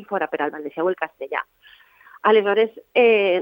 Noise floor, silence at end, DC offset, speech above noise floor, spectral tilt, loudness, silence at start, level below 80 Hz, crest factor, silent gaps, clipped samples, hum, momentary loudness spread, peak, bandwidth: -51 dBFS; 0 s; under 0.1%; 31 dB; -7 dB/octave; -21 LUFS; 0 s; -76 dBFS; 16 dB; none; under 0.1%; none; 12 LU; -4 dBFS; 16.5 kHz